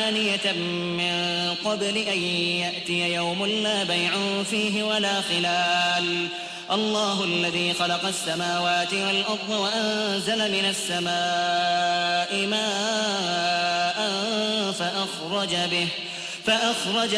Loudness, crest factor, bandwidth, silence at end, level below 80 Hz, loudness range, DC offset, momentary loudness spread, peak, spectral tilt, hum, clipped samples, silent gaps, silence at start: -23 LUFS; 16 dB; 11 kHz; 0 s; -66 dBFS; 1 LU; under 0.1%; 3 LU; -10 dBFS; -3 dB/octave; none; under 0.1%; none; 0 s